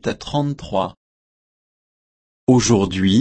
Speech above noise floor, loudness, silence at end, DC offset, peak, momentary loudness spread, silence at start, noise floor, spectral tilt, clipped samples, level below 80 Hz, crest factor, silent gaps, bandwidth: over 73 dB; -19 LUFS; 0 s; under 0.1%; -2 dBFS; 9 LU; 0.05 s; under -90 dBFS; -5.5 dB/octave; under 0.1%; -46 dBFS; 18 dB; 0.97-2.47 s; 8.8 kHz